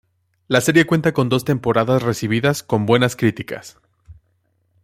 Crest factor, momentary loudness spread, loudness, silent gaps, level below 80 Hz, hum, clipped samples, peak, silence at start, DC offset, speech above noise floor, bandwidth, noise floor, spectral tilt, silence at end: 18 dB; 6 LU; -18 LUFS; none; -54 dBFS; none; under 0.1%; -2 dBFS; 0.5 s; under 0.1%; 48 dB; 16.5 kHz; -65 dBFS; -5.5 dB/octave; 0.7 s